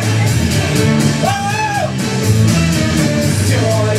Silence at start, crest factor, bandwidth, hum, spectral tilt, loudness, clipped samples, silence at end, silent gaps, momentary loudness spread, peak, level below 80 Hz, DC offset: 0 s; 12 dB; 15.5 kHz; none; -5 dB/octave; -14 LUFS; under 0.1%; 0 s; none; 4 LU; 0 dBFS; -32 dBFS; under 0.1%